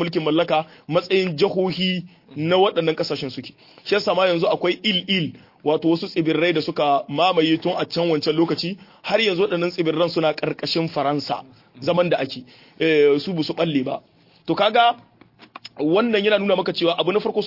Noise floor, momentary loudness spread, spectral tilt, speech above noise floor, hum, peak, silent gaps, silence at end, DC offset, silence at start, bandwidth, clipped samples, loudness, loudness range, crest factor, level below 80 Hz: -45 dBFS; 11 LU; -6.5 dB/octave; 25 dB; none; -4 dBFS; none; 0 s; under 0.1%; 0 s; 5.8 kHz; under 0.1%; -21 LUFS; 2 LU; 16 dB; -66 dBFS